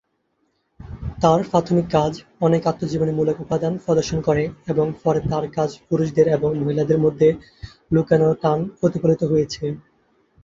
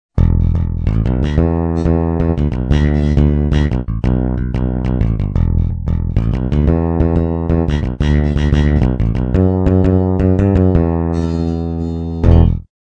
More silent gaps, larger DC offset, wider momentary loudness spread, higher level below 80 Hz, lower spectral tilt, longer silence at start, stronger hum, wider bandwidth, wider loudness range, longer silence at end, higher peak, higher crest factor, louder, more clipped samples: neither; neither; first, 8 LU vs 5 LU; second, -46 dBFS vs -18 dBFS; second, -7.5 dB/octave vs -9.5 dB/octave; first, 0.8 s vs 0.15 s; neither; first, 7.6 kHz vs 6.4 kHz; about the same, 2 LU vs 3 LU; first, 0.65 s vs 0.25 s; about the same, -2 dBFS vs 0 dBFS; about the same, 18 dB vs 14 dB; second, -20 LUFS vs -15 LUFS; second, under 0.1% vs 0.1%